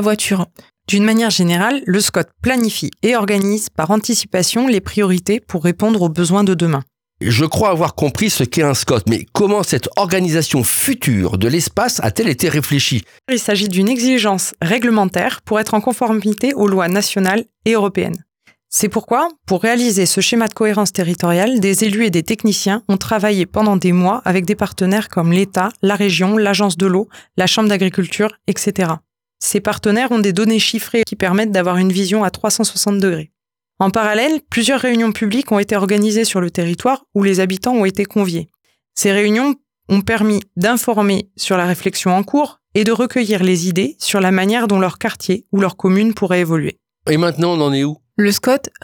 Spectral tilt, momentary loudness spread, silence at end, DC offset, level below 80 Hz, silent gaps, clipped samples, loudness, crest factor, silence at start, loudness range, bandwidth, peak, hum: -4.5 dB/octave; 5 LU; 0.15 s; under 0.1%; -50 dBFS; none; under 0.1%; -15 LUFS; 12 dB; 0 s; 2 LU; over 20 kHz; -4 dBFS; none